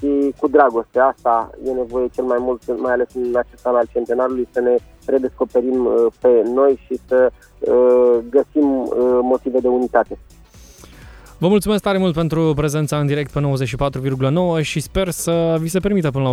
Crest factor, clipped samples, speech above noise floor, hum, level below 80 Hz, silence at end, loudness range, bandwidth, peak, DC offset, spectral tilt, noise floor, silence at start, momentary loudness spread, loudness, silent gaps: 16 dB; under 0.1%; 26 dB; none; -42 dBFS; 0 s; 4 LU; 14.5 kHz; 0 dBFS; under 0.1%; -6.5 dB/octave; -43 dBFS; 0 s; 7 LU; -18 LUFS; none